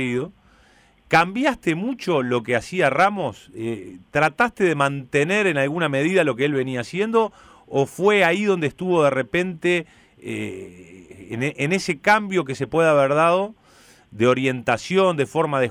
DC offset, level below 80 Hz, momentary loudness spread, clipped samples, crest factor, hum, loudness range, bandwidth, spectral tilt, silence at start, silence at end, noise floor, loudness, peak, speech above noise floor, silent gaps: under 0.1%; -58 dBFS; 12 LU; under 0.1%; 16 dB; none; 3 LU; 15.5 kHz; -5.5 dB/octave; 0 s; 0 s; -55 dBFS; -21 LUFS; -6 dBFS; 34 dB; none